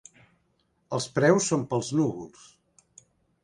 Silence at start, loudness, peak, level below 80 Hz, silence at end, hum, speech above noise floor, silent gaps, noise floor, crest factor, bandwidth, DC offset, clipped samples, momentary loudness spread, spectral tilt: 0.9 s; -26 LUFS; -6 dBFS; -66 dBFS; 1.15 s; none; 45 dB; none; -71 dBFS; 22 dB; 11.5 kHz; under 0.1%; under 0.1%; 15 LU; -5 dB/octave